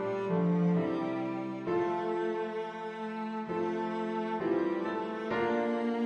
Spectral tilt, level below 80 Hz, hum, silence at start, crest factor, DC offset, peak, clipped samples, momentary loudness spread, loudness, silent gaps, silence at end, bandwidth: -8.5 dB/octave; -72 dBFS; none; 0 s; 14 dB; under 0.1%; -18 dBFS; under 0.1%; 8 LU; -33 LUFS; none; 0 s; 7.8 kHz